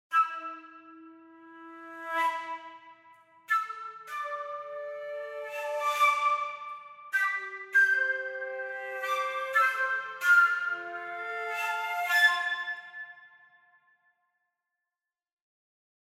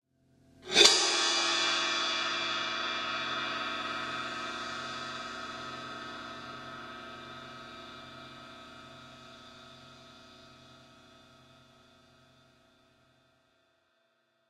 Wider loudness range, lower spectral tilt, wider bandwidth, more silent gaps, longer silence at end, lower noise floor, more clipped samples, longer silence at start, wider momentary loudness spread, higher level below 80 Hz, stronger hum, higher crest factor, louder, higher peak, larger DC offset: second, 9 LU vs 25 LU; about the same, 0.5 dB/octave vs 0 dB/octave; about the same, 16 kHz vs 16 kHz; neither; second, 2.8 s vs 3.3 s; first, under -90 dBFS vs -74 dBFS; neither; second, 0.1 s vs 0.6 s; second, 19 LU vs 25 LU; second, under -90 dBFS vs -72 dBFS; neither; second, 20 dB vs 32 dB; about the same, -28 LUFS vs -29 LUFS; second, -12 dBFS vs -4 dBFS; neither